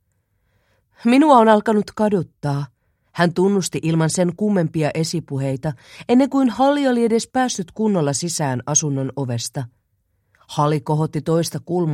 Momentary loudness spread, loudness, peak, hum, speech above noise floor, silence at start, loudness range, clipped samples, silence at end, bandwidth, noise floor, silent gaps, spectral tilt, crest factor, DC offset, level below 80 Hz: 10 LU; -19 LUFS; 0 dBFS; none; 49 dB; 1 s; 4 LU; under 0.1%; 0 s; 15.5 kHz; -67 dBFS; none; -5.5 dB/octave; 18 dB; under 0.1%; -58 dBFS